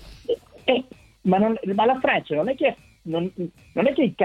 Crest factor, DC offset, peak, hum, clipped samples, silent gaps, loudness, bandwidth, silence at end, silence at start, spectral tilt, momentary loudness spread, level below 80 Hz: 18 dB; under 0.1%; -4 dBFS; none; under 0.1%; none; -23 LUFS; 9.8 kHz; 0 s; 0 s; -7.5 dB/octave; 10 LU; -56 dBFS